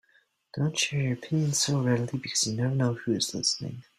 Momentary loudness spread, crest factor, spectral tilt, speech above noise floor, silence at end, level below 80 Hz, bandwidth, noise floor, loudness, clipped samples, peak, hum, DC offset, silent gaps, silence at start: 5 LU; 16 dB; -4 dB/octave; 39 dB; 0.15 s; -64 dBFS; 14.5 kHz; -67 dBFS; -27 LUFS; under 0.1%; -12 dBFS; none; under 0.1%; none; 0.55 s